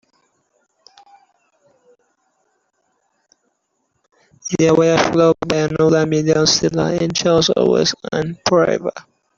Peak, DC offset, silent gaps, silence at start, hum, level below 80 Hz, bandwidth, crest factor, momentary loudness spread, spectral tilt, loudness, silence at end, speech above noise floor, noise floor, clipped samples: 0 dBFS; under 0.1%; none; 4.45 s; none; -50 dBFS; 7.6 kHz; 18 dB; 9 LU; -4.5 dB/octave; -16 LUFS; 0.35 s; 54 dB; -69 dBFS; under 0.1%